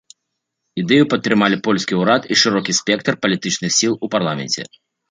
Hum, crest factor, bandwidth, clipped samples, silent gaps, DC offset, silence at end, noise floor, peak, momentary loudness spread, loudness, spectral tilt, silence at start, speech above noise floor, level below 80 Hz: none; 16 dB; 9.6 kHz; under 0.1%; none; under 0.1%; 0.45 s; -77 dBFS; -2 dBFS; 8 LU; -17 LUFS; -3.5 dB/octave; 0.75 s; 60 dB; -60 dBFS